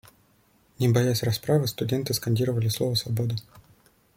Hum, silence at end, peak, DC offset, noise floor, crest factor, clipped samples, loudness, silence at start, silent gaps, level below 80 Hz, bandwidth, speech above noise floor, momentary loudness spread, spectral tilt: none; 0.55 s; -8 dBFS; under 0.1%; -63 dBFS; 18 dB; under 0.1%; -25 LUFS; 0.8 s; none; -58 dBFS; 16.5 kHz; 38 dB; 5 LU; -5.5 dB/octave